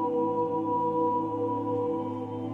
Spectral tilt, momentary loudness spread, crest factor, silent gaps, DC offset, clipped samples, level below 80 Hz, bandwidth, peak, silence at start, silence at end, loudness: -10 dB/octave; 5 LU; 12 dB; none; under 0.1%; under 0.1%; -66 dBFS; 4.1 kHz; -16 dBFS; 0 s; 0 s; -29 LUFS